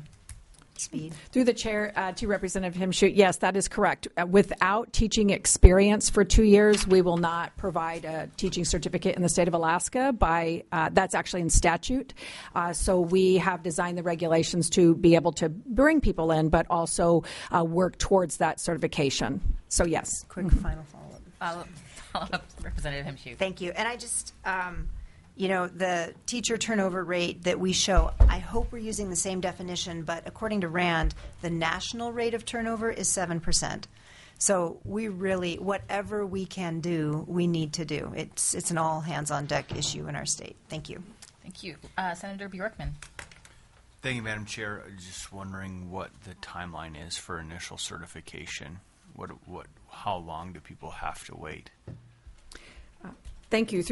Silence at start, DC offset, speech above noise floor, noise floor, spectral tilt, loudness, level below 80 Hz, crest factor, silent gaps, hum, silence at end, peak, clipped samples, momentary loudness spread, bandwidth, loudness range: 0 s; under 0.1%; 30 dB; -56 dBFS; -4.5 dB/octave; -27 LUFS; -36 dBFS; 28 dB; none; none; 0 s; 0 dBFS; under 0.1%; 18 LU; 11.5 kHz; 16 LU